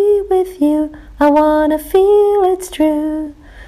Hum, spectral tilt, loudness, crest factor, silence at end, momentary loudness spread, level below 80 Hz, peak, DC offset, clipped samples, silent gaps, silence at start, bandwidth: none; -5 dB/octave; -14 LUFS; 10 dB; 0 s; 10 LU; -40 dBFS; -2 dBFS; under 0.1%; under 0.1%; none; 0 s; 15.5 kHz